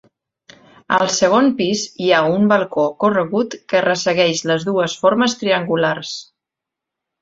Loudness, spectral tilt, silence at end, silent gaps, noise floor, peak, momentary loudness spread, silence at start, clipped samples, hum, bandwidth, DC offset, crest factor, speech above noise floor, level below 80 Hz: -17 LUFS; -4 dB/octave; 1 s; none; -84 dBFS; 0 dBFS; 6 LU; 0.9 s; under 0.1%; none; 8 kHz; under 0.1%; 16 dB; 68 dB; -60 dBFS